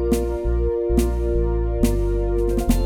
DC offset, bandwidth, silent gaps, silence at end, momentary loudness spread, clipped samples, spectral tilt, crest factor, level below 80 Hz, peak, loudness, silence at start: under 0.1%; 16.5 kHz; none; 0 s; 2 LU; under 0.1%; -7.5 dB/octave; 14 dB; -22 dBFS; -4 dBFS; -22 LUFS; 0 s